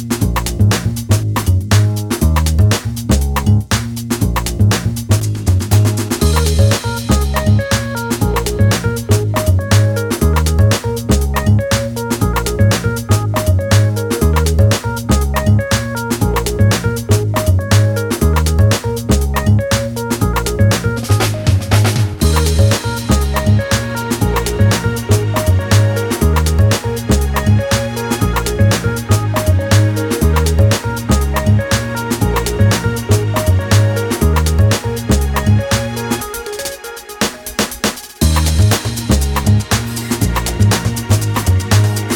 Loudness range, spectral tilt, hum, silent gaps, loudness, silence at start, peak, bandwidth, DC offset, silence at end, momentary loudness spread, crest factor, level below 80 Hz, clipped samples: 1 LU; -5.5 dB/octave; none; none; -14 LUFS; 0 s; 0 dBFS; 19.5 kHz; under 0.1%; 0 s; 5 LU; 14 dB; -22 dBFS; under 0.1%